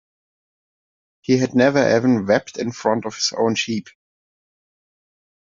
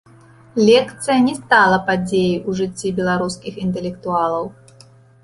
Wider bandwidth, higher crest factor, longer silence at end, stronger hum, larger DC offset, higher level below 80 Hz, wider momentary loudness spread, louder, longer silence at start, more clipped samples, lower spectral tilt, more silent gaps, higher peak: second, 7.6 kHz vs 11.5 kHz; about the same, 18 dB vs 16 dB; first, 1.5 s vs 0.7 s; neither; neither; second, -60 dBFS vs -50 dBFS; about the same, 10 LU vs 12 LU; about the same, -19 LUFS vs -18 LUFS; first, 1.3 s vs 0.55 s; neither; about the same, -4.5 dB/octave vs -5 dB/octave; neither; about the same, -2 dBFS vs -2 dBFS